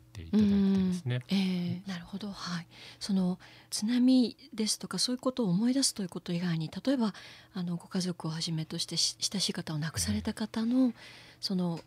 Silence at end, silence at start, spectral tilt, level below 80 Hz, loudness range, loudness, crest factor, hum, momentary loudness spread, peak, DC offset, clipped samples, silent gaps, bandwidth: 0.05 s; 0.15 s; -4.5 dB/octave; -64 dBFS; 3 LU; -31 LUFS; 16 dB; none; 12 LU; -14 dBFS; under 0.1%; under 0.1%; none; 15.5 kHz